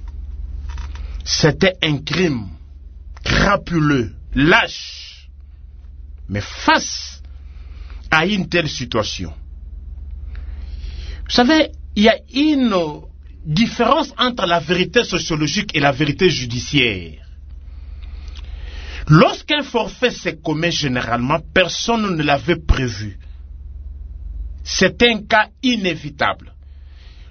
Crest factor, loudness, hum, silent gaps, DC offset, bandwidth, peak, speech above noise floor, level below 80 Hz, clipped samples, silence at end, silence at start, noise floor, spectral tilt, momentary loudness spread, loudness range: 20 dB; -17 LUFS; none; none; under 0.1%; 6.6 kHz; 0 dBFS; 22 dB; -32 dBFS; under 0.1%; 0 s; 0 s; -39 dBFS; -4.5 dB/octave; 21 LU; 5 LU